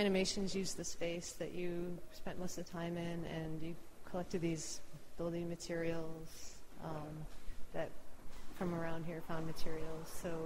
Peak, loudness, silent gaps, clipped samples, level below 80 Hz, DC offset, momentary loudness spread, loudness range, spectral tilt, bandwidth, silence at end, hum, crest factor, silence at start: -22 dBFS; -43 LUFS; none; under 0.1%; -54 dBFS; under 0.1%; 12 LU; 3 LU; -5 dB/octave; 16 kHz; 0 s; none; 16 dB; 0 s